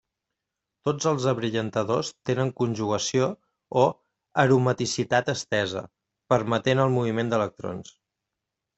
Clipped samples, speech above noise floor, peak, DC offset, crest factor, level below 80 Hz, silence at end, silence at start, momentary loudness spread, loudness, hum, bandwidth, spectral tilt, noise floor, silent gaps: under 0.1%; 61 dB; -6 dBFS; under 0.1%; 20 dB; -62 dBFS; 0.95 s; 0.85 s; 8 LU; -25 LUFS; none; 8.2 kHz; -5.5 dB/octave; -85 dBFS; none